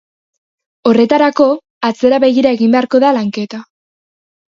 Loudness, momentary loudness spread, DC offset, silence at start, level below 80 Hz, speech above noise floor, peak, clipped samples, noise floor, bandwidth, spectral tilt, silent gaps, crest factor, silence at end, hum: -12 LUFS; 9 LU; under 0.1%; 0.85 s; -58 dBFS; over 79 dB; 0 dBFS; under 0.1%; under -90 dBFS; 7.4 kHz; -6 dB/octave; 1.70-1.81 s; 14 dB; 0.9 s; none